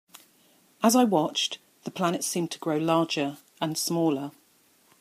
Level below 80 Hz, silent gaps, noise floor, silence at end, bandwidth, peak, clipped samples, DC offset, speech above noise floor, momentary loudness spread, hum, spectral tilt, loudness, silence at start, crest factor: -78 dBFS; none; -63 dBFS; 0.7 s; 15.5 kHz; -8 dBFS; under 0.1%; under 0.1%; 37 dB; 12 LU; none; -4 dB/octave; -26 LUFS; 0.8 s; 20 dB